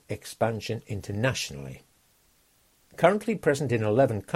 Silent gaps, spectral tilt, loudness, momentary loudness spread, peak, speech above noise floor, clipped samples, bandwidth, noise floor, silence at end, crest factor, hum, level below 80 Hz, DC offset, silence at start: none; -5.5 dB/octave; -27 LUFS; 12 LU; -6 dBFS; 38 dB; under 0.1%; 16 kHz; -64 dBFS; 0 s; 22 dB; none; -58 dBFS; under 0.1%; 0.1 s